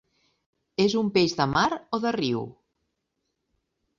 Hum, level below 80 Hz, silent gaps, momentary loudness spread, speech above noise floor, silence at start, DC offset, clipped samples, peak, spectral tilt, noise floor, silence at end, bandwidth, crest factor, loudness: none; -58 dBFS; none; 9 LU; 55 dB; 0.8 s; under 0.1%; under 0.1%; -8 dBFS; -5 dB/octave; -79 dBFS; 1.5 s; 7.6 kHz; 20 dB; -25 LUFS